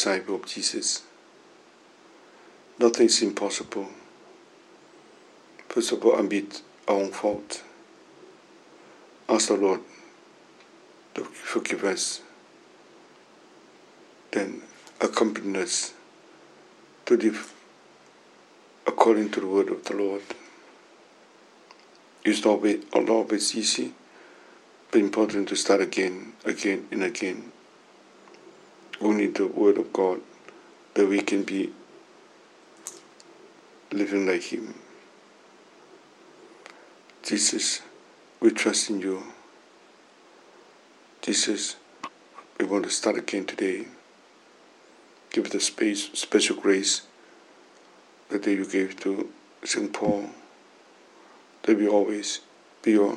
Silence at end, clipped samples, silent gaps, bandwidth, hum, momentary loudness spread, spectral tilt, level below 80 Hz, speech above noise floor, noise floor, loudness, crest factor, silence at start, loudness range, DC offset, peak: 0 s; under 0.1%; none; 12.5 kHz; none; 16 LU; -2.5 dB/octave; -76 dBFS; 30 dB; -55 dBFS; -26 LUFS; 28 dB; 0 s; 6 LU; under 0.1%; 0 dBFS